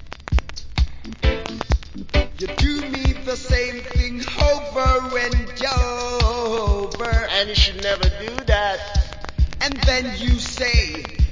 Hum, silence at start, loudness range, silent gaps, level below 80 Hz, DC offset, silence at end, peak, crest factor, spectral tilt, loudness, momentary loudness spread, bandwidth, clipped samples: none; 0 s; 3 LU; none; -22 dBFS; under 0.1%; 0 s; -2 dBFS; 18 dB; -4.5 dB/octave; -21 LUFS; 6 LU; 7.6 kHz; under 0.1%